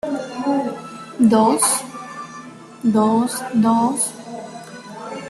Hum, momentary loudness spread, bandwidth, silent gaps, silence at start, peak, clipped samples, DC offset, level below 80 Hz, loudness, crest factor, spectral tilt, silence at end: none; 20 LU; 13 kHz; none; 0.05 s; -4 dBFS; under 0.1%; under 0.1%; -62 dBFS; -18 LUFS; 16 dB; -4.5 dB/octave; 0 s